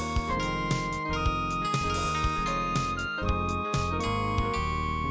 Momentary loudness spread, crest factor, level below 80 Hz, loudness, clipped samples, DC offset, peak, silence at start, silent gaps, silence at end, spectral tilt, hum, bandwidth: 2 LU; 14 dB; -36 dBFS; -29 LUFS; under 0.1%; under 0.1%; -14 dBFS; 0 s; none; 0 s; -5 dB/octave; none; 8 kHz